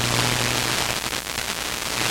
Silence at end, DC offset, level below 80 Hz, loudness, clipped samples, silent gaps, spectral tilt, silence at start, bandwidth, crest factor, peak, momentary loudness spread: 0 s; under 0.1%; -42 dBFS; -23 LUFS; under 0.1%; none; -2 dB/octave; 0 s; 17 kHz; 22 dB; -2 dBFS; 5 LU